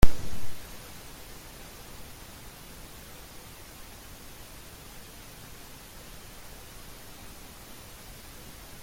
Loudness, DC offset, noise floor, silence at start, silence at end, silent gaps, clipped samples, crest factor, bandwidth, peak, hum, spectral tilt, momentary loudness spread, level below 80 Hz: -44 LUFS; under 0.1%; -46 dBFS; 0 s; 8.2 s; none; under 0.1%; 24 dB; 16.5 kHz; -2 dBFS; none; -4.5 dB/octave; 2 LU; -38 dBFS